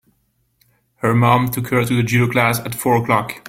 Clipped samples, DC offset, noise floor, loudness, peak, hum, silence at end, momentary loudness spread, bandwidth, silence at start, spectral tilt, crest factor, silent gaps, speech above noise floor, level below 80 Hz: under 0.1%; under 0.1%; -65 dBFS; -17 LUFS; -2 dBFS; none; 0 s; 5 LU; 16.5 kHz; 1.05 s; -6 dB/octave; 16 dB; none; 48 dB; -50 dBFS